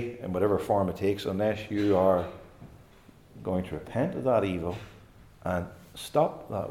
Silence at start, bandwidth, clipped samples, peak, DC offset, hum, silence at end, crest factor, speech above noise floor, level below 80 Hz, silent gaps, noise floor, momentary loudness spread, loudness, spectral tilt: 0 s; 16.5 kHz; under 0.1%; -10 dBFS; under 0.1%; none; 0 s; 18 dB; 27 dB; -58 dBFS; none; -55 dBFS; 15 LU; -29 LUFS; -7 dB/octave